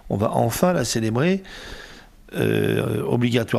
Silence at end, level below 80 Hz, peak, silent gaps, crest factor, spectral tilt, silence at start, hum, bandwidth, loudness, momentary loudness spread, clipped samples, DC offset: 0 s; -48 dBFS; -6 dBFS; none; 16 dB; -5.5 dB/octave; 0.05 s; none; 15.5 kHz; -21 LUFS; 17 LU; under 0.1%; under 0.1%